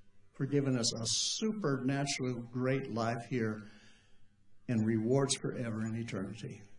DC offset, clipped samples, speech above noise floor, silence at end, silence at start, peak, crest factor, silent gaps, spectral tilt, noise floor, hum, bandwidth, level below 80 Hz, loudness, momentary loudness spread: under 0.1%; under 0.1%; 24 dB; 0 s; 0.05 s; -18 dBFS; 18 dB; none; -4.5 dB/octave; -58 dBFS; none; 11 kHz; -68 dBFS; -34 LUFS; 10 LU